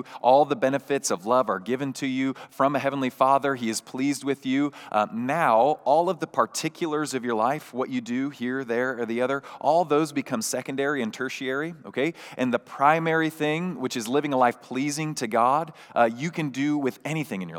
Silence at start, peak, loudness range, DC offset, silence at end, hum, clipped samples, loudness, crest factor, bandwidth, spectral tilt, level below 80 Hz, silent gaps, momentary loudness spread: 0 s; -4 dBFS; 2 LU; under 0.1%; 0 s; none; under 0.1%; -25 LUFS; 20 dB; 17.5 kHz; -4.5 dB/octave; -90 dBFS; none; 8 LU